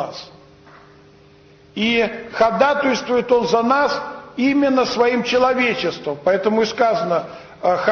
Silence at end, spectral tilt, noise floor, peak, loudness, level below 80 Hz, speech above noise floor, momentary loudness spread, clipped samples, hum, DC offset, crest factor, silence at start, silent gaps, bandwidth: 0 s; -4.5 dB/octave; -48 dBFS; -4 dBFS; -18 LUFS; -54 dBFS; 30 dB; 8 LU; under 0.1%; none; under 0.1%; 14 dB; 0 s; none; 6.8 kHz